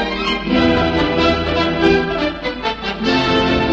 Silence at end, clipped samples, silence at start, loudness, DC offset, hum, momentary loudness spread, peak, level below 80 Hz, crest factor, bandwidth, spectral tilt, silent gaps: 0 s; under 0.1%; 0 s; -16 LUFS; under 0.1%; none; 7 LU; -2 dBFS; -32 dBFS; 14 dB; 8 kHz; -6 dB/octave; none